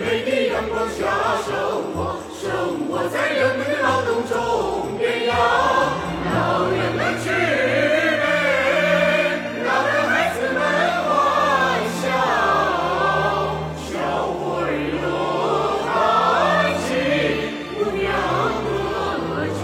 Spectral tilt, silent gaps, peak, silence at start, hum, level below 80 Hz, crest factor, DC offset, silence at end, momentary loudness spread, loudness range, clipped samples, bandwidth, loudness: -5 dB/octave; none; -6 dBFS; 0 s; none; -46 dBFS; 14 dB; under 0.1%; 0 s; 7 LU; 3 LU; under 0.1%; 16.5 kHz; -20 LUFS